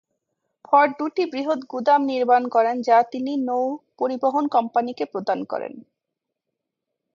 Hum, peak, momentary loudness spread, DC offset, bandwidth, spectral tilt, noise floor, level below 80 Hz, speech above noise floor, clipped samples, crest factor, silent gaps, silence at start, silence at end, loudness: none; -4 dBFS; 9 LU; under 0.1%; 7.2 kHz; -5.5 dB/octave; -83 dBFS; -78 dBFS; 62 dB; under 0.1%; 18 dB; none; 0.7 s; 1.35 s; -22 LUFS